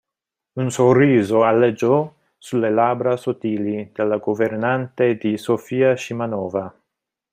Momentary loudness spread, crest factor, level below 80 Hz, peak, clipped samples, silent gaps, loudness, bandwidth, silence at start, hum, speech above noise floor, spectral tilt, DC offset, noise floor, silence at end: 11 LU; 16 dB; -62 dBFS; -4 dBFS; under 0.1%; none; -19 LUFS; 15 kHz; 0.55 s; none; 67 dB; -7 dB/octave; under 0.1%; -85 dBFS; 0.65 s